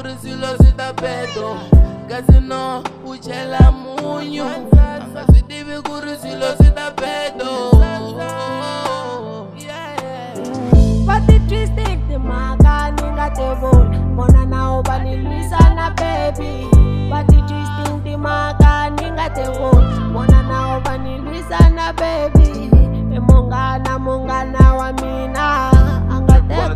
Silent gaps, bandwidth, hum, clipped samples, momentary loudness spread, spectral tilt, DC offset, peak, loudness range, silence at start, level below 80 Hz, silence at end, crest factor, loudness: none; 11 kHz; none; under 0.1%; 13 LU; -7.5 dB/octave; 0.2%; 0 dBFS; 3 LU; 0 s; -16 dBFS; 0 s; 14 dB; -15 LUFS